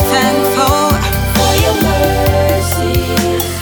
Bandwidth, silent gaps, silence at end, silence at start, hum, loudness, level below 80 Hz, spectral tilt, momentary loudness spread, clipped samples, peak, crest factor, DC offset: over 20 kHz; none; 0 s; 0 s; none; -12 LUFS; -22 dBFS; -4.5 dB/octave; 3 LU; under 0.1%; 0 dBFS; 12 dB; under 0.1%